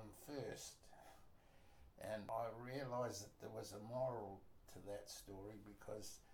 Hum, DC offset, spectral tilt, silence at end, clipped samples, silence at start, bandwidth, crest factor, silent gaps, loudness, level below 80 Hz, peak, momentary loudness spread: none; under 0.1%; -4.5 dB/octave; 0 s; under 0.1%; 0 s; 19 kHz; 18 dB; none; -50 LUFS; -72 dBFS; -34 dBFS; 18 LU